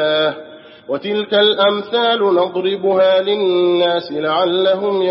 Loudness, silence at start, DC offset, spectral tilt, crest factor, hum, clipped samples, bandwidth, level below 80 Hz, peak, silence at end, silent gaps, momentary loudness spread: -15 LUFS; 0 s; under 0.1%; -2 dB/octave; 14 dB; none; under 0.1%; 5.8 kHz; -70 dBFS; -2 dBFS; 0 s; none; 7 LU